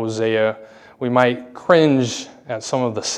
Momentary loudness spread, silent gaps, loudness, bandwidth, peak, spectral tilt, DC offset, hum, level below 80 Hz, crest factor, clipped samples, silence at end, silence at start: 14 LU; none; -19 LUFS; 11 kHz; 0 dBFS; -5 dB/octave; under 0.1%; none; -64 dBFS; 18 dB; under 0.1%; 0 s; 0 s